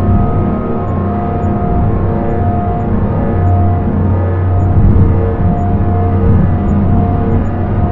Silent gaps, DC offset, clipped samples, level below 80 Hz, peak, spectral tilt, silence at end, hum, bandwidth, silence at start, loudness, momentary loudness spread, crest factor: none; under 0.1%; under 0.1%; -20 dBFS; 0 dBFS; -12 dB/octave; 0 s; none; 3.3 kHz; 0 s; -13 LUFS; 5 LU; 10 dB